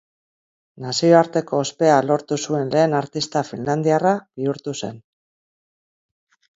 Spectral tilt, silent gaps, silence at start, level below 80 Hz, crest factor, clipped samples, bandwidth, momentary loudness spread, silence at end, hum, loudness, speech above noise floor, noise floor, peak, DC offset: -5.5 dB/octave; none; 0.8 s; -66 dBFS; 20 dB; under 0.1%; 8 kHz; 12 LU; 1.6 s; none; -20 LUFS; over 71 dB; under -90 dBFS; 0 dBFS; under 0.1%